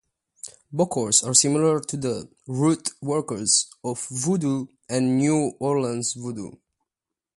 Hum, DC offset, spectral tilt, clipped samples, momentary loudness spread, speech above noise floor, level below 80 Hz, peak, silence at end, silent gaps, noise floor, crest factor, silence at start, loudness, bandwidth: none; under 0.1%; -4 dB/octave; under 0.1%; 15 LU; 64 dB; -64 dBFS; -4 dBFS; 0.8 s; none; -88 dBFS; 22 dB; 0.45 s; -23 LUFS; 11.5 kHz